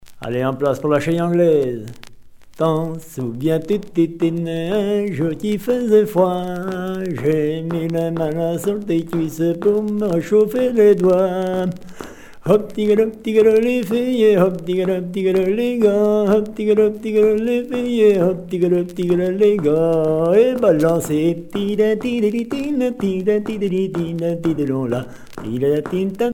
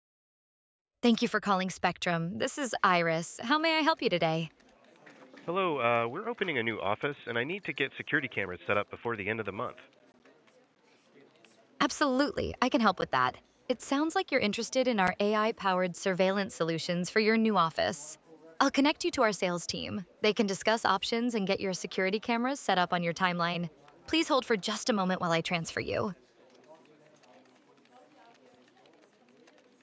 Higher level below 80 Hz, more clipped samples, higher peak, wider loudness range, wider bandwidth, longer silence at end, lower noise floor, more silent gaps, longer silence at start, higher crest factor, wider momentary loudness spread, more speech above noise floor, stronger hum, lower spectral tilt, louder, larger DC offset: first, -50 dBFS vs -64 dBFS; neither; first, 0 dBFS vs -10 dBFS; about the same, 4 LU vs 6 LU; first, 17 kHz vs 8 kHz; second, 0 s vs 3.05 s; second, -40 dBFS vs -62 dBFS; neither; second, 0.05 s vs 1.05 s; second, 16 dB vs 22 dB; about the same, 9 LU vs 8 LU; second, 22 dB vs 32 dB; neither; first, -7.5 dB/octave vs -4.5 dB/octave; first, -18 LUFS vs -30 LUFS; neither